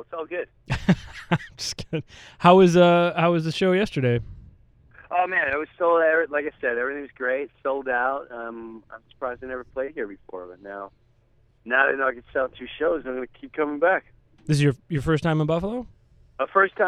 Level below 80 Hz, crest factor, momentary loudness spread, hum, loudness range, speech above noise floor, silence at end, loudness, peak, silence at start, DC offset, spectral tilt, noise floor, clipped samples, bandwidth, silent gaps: -50 dBFS; 22 dB; 16 LU; none; 10 LU; 37 dB; 0 s; -23 LUFS; -2 dBFS; 0 s; under 0.1%; -6 dB/octave; -60 dBFS; under 0.1%; 12 kHz; none